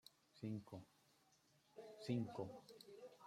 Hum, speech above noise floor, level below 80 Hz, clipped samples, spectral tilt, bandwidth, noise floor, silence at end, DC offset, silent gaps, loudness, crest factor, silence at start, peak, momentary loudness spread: none; 29 dB; -88 dBFS; under 0.1%; -7 dB/octave; 15.5 kHz; -77 dBFS; 0 s; under 0.1%; none; -51 LUFS; 22 dB; 0.05 s; -32 dBFS; 17 LU